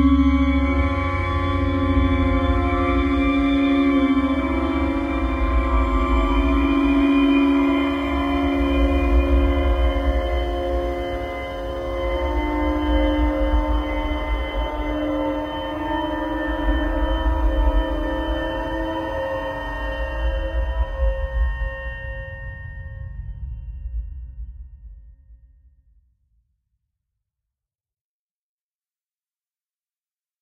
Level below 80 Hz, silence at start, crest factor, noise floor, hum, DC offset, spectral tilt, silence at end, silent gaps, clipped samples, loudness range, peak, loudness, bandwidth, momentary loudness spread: -26 dBFS; 0 s; 16 dB; under -90 dBFS; none; under 0.1%; -8 dB/octave; 5.05 s; none; under 0.1%; 14 LU; -6 dBFS; -22 LUFS; 6.4 kHz; 15 LU